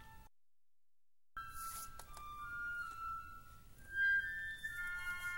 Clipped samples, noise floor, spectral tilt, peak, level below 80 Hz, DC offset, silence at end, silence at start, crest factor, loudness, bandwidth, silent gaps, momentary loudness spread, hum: under 0.1%; under -90 dBFS; -1 dB/octave; -28 dBFS; -60 dBFS; under 0.1%; 0 s; 0 s; 16 dB; -41 LUFS; 20 kHz; none; 21 LU; none